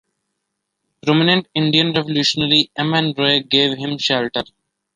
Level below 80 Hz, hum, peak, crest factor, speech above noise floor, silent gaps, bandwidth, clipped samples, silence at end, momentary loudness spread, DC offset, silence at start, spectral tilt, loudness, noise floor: -58 dBFS; none; 0 dBFS; 18 dB; 59 dB; none; 9.8 kHz; under 0.1%; 0.5 s; 7 LU; under 0.1%; 1.05 s; -5 dB/octave; -16 LUFS; -76 dBFS